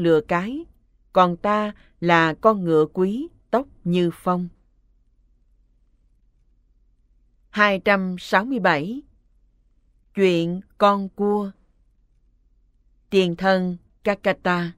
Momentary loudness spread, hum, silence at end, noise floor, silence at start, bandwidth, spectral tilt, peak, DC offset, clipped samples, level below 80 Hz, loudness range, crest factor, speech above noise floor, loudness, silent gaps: 12 LU; none; 0.05 s; -60 dBFS; 0 s; 14.5 kHz; -6.5 dB/octave; -2 dBFS; under 0.1%; under 0.1%; -56 dBFS; 7 LU; 20 dB; 40 dB; -21 LUFS; none